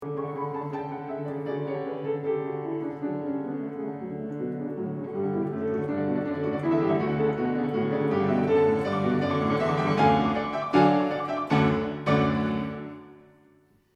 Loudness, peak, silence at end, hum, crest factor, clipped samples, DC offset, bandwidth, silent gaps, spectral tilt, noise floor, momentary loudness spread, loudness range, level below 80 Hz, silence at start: -27 LUFS; -8 dBFS; 0.8 s; none; 18 dB; under 0.1%; under 0.1%; 9 kHz; none; -8 dB/octave; -61 dBFS; 11 LU; 8 LU; -56 dBFS; 0 s